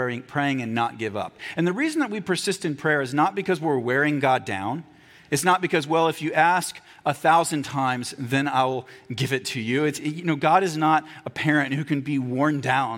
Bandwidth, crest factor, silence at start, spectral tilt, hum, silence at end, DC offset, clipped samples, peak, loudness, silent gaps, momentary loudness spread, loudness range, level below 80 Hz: 17 kHz; 18 dB; 0 s; -5 dB/octave; none; 0 s; under 0.1%; under 0.1%; -6 dBFS; -23 LUFS; none; 9 LU; 2 LU; -68 dBFS